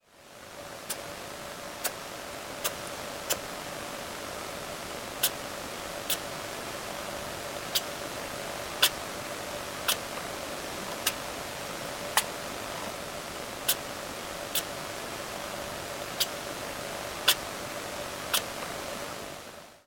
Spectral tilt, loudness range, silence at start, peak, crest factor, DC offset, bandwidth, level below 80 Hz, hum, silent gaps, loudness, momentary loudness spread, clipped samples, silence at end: -1.5 dB/octave; 4 LU; 0.1 s; -6 dBFS; 30 dB; under 0.1%; 17 kHz; -58 dBFS; none; none; -33 LUFS; 9 LU; under 0.1%; 0.05 s